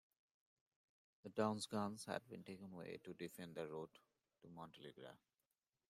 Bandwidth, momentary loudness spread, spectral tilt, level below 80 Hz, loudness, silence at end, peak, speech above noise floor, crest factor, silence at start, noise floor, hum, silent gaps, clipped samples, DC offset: 15.5 kHz; 19 LU; -5 dB/octave; -88 dBFS; -49 LUFS; 0.75 s; -26 dBFS; over 41 dB; 24 dB; 1.25 s; under -90 dBFS; none; none; under 0.1%; under 0.1%